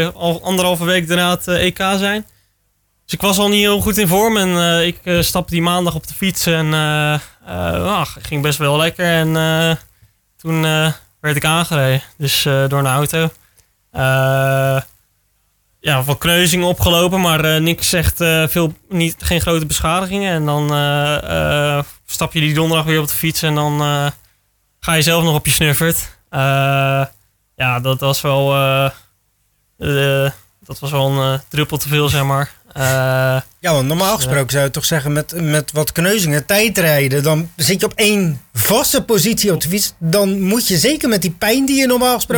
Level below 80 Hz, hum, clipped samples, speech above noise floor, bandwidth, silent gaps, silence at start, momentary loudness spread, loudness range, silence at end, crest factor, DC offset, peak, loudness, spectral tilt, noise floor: -38 dBFS; none; under 0.1%; 48 dB; 19.5 kHz; none; 0 s; 7 LU; 3 LU; 0 s; 14 dB; under 0.1%; -2 dBFS; -15 LUFS; -4 dB/octave; -63 dBFS